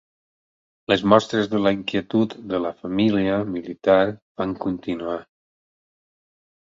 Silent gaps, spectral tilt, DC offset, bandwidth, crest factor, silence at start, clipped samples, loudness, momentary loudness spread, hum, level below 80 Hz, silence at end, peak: 4.22-4.35 s; -6.5 dB/octave; under 0.1%; 7.6 kHz; 22 dB; 0.9 s; under 0.1%; -22 LUFS; 11 LU; none; -56 dBFS; 1.45 s; -2 dBFS